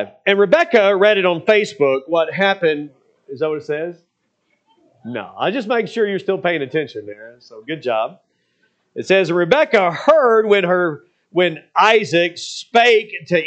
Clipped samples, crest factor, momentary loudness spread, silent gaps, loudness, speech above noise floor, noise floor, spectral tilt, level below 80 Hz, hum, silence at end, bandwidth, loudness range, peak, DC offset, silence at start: under 0.1%; 18 dB; 16 LU; none; -16 LUFS; 51 dB; -67 dBFS; -5 dB/octave; -68 dBFS; none; 0 s; 8.6 kHz; 8 LU; 0 dBFS; under 0.1%; 0 s